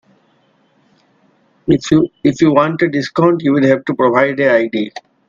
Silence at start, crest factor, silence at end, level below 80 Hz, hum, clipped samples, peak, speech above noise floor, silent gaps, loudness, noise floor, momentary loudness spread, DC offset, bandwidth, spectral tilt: 1.65 s; 14 dB; 0.3 s; -50 dBFS; none; under 0.1%; 0 dBFS; 43 dB; none; -14 LUFS; -56 dBFS; 6 LU; under 0.1%; 7.6 kHz; -6.5 dB/octave